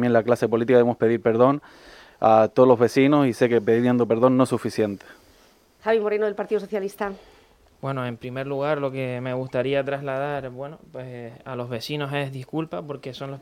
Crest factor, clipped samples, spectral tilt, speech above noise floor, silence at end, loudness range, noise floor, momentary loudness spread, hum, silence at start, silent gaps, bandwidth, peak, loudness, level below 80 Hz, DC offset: 20 dB; under 0.1%; -7 dB/octave; 34 dB; 0 s; 9 LU; -56 dBFS; 17 LU; none; 0 s; none; 15.5 kHz; -4 dBFS; -22 LUFS; -62 dBFS; under 0.1%